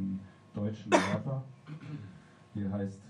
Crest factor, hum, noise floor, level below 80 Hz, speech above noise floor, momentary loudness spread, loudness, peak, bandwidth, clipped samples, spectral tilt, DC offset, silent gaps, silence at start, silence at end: 26 dB; none; -53 dBFS; -70 dBFS; 21 dB; 19 LU; -34 LUFS; -8 dBFS; 11.5 kHz; under 0.1%; -6 dB/octave; under 0.1%; none; 0 s; 0 s